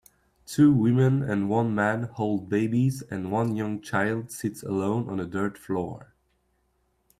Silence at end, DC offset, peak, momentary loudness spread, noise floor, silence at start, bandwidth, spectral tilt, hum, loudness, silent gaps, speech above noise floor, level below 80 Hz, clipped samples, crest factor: 1.15 s; under 0.1%; -10 dBFS; 11 LU; -71 dBFS; 0.5 s; 15 kHz; -7.5 dB/octave; none; -26 LUFS; none; 46 dB; -62 dBFS; under 0.1%; 16 dB